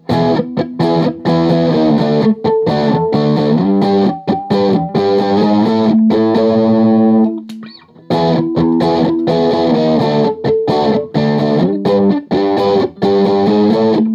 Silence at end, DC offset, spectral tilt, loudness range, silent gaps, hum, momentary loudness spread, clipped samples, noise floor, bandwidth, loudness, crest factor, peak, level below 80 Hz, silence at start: 0 s; under 0.1%; -8.5 dB/octave; 1 LU; none; none; 4 LU; under 0.1%; -35 dBFS; 7.2 kHz; -13 LUFS; 12 dB; 0 dBFS; -52 dBFS; 0.1 s